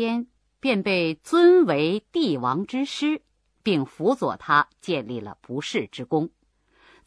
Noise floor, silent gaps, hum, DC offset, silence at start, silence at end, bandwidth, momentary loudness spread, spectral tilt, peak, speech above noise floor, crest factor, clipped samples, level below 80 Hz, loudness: -61 dBFS; none; none; under 0.1%; 0 s; 0.8 s; 11 kHz; 14 LU; -6 dB/octave; -6 dBFS; 38 dB; 18 dB; under 0.1%; -66 dBFS; -23 LUFS